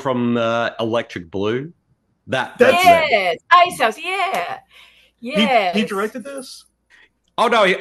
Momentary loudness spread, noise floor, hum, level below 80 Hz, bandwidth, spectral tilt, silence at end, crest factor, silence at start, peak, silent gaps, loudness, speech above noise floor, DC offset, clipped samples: 18 LU; -64 dBFS; none; -62 dBFS; 12.5 kHz; -4.5 dB/octave; 0 s; 18 dB; 0 s; 0 dBFS; none; -17 LUFS; 46 dB; under 0.1%; under 0.1%